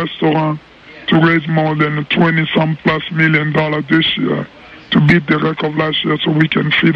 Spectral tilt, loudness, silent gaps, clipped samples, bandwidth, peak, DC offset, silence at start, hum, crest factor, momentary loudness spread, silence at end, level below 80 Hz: -8 dB/octave; -14 LUFS; none; under 0.1%; 6 kHz; 0 dBFS; under 0.1%; 0 s; none; 14 dB; 6 LU; 0 s; -46 dBFS